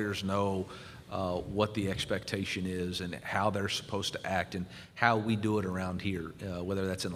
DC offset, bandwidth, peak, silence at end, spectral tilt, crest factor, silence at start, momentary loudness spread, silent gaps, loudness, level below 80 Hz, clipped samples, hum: under 0.1%; 15.5 kHz; -8 dBFS; 0 s; -5 dB/octave; 24 dB; 0 s; 9 LU; none; -33 LUFS; -58 dBFS; under 0.1%; none